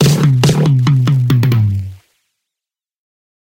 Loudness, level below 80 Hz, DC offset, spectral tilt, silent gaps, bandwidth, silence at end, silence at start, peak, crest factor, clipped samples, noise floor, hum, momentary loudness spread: -12 LUFS; -44 dBFS; under 0.1%; -6.5 dB/octave; none; 17 kHz; 1.45 s; 0 s; 0 dBFS; 14 dB; under 0.1%; -86 dBFS; none; 7 LU